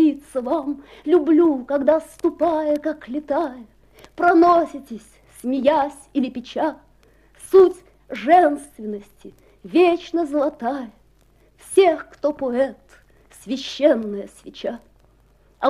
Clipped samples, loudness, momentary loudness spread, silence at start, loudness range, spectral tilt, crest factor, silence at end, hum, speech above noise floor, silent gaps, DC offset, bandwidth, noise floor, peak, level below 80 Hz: under 0.1%; -20 LUFS; 17 LU; 0 s; 4 LU; -5 dB/octave; 18 dB; 0 s; none; 36 dB; none; under 0.1%; 13 kHz; -56 dBFS; -2 dBFS; -56 dBFS